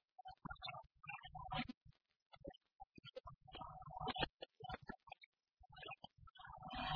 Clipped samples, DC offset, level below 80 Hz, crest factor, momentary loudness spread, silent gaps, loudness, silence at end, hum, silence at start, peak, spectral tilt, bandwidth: under 0.1%; under 0.1%; -66 dBFS; 28 dB; 15 LU; 1.77-1.81 s, 2.22-2.30 s, 2.75-2.79 s, 4.30-4.34 s, 5.26-5.32 s, 6.30-6.34 s; -52 LUFS; 0 s; none; 0.2 s; -24 dBFS; -2.5 dB/octave; 5.4 kHz